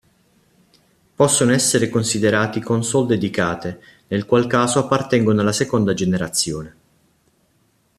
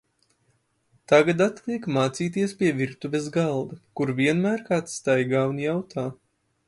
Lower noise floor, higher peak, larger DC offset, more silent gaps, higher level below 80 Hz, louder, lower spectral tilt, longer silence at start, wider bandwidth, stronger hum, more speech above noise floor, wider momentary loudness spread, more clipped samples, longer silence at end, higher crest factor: second, -62 dBFS vs -69 dBFS; about the same, -2 dBFS vs -4 dBFS; neither; neither; first, -54 dBFS vs -66 dBFS; first, -18 LUFS vs -24 LUFS; second, -4.5 dB/octave vs -6 dB/octave; about the same, 1.2 s vs 1.1 s; first, 14.5 kHz vs 11.5 kHz; neither; about the same, 44 dB vs 45 dB; about the same, 9 LU vs 10 LU; neither; first, 1.3 s vs 0.55 s; about the same, 16 dB vs 20 dB